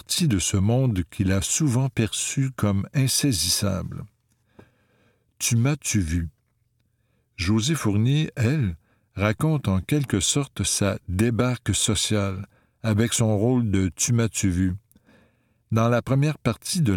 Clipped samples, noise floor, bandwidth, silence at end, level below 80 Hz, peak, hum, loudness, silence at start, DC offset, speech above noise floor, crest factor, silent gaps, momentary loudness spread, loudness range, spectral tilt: under 0.1%; -69 dBFS; 18 kHz; 0 s; -46 dBFS; -4 dBFS; none; -23 LUFS; 0.1 s; under 0.1%; 46 dB; 20 dB; none; 7 LU; 3 LU; -4.5 dB/octave